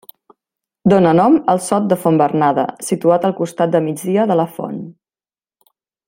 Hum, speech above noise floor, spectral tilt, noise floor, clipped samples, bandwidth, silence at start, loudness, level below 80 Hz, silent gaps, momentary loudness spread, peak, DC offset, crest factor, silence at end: none; over 75 dB; -6.5 dB/octave; under -90 dBFS; under 0.1%; 16.5 kHz; 0.85 s; -15 LUFS; -58 dBFS; none; 10 LU; 0 dBFS; under 0.1%; 16 dB; 1.15 s